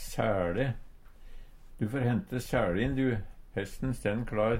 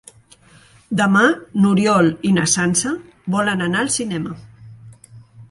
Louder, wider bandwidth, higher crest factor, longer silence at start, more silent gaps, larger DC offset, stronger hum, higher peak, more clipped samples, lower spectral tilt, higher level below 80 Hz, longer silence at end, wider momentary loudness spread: second, -32 LUFS vs -17 LUFS; first, 16.5 kHz vs 11.5 kHz; about the same, 18 dB vs 18 dB; second, 0 s vs 0.9 s; neither; neither; neither; second, -14 dBFS vs 0 dBFS; neither; first, -7 dB/octave vs -4.5 dB/octave; first, -44 dBFS vs -54 dBFS; about the same, 0 s vs 0.05 s; about the same, 9 LU vs 11 LU